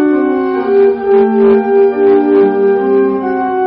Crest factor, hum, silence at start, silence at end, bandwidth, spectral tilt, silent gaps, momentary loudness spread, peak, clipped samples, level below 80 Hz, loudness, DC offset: 8 dB; none; 0 s; 0 s; 4.6 kHz; -6 dB/octave; none; 5 LU; -2 dBFS; under 0.1%; -50 dBFS; -10 LUFS; under 0.1%